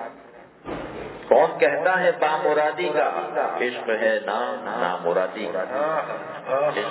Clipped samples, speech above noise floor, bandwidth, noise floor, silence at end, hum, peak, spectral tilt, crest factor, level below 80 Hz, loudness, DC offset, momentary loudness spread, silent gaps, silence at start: under 0.1%; 24 dB; 4 kHz; -46 dBFS; 0 s; none; -2 dBFS; -8.5 dB/octave; 20 dB; -60 dBFS; -23 LUFS; under 0.1%; 14 LU; none; 0 s